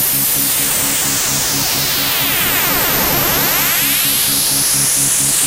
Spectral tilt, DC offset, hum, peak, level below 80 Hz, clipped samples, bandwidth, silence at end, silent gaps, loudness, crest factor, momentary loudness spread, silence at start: -1 dB/octave; under 0.1%; none; 0 dBFS; -38 dBFS; under 0.1%; 16 kHz; 0 s; none; -12 LUFS; 14 dB; 2 LU; 0 s